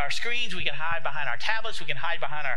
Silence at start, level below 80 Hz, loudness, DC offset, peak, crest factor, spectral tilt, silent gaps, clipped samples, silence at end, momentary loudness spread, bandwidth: 0 s; -54 dBFS; -29 LUFS; 10%; -8 dBFS; 20 dB; -2.5 dB/octave; none; under 0.1%; 0 s; 3 LU; 15.5 kHz